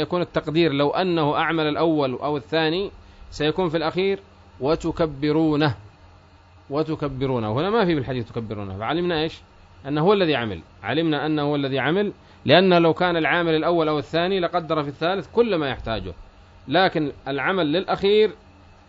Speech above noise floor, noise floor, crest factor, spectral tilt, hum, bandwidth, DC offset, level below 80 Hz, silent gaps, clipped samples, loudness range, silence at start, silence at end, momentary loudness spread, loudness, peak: 29 dB; -50 dBFS; 20 dB; -7 dB/octave; none; 7.8 kHz; under 0.1%; -48 dBFS; none; under 0.1%; 5 LU; 0 s; 0.55 s; 10 LU; -22 LUFS; -4 dBFS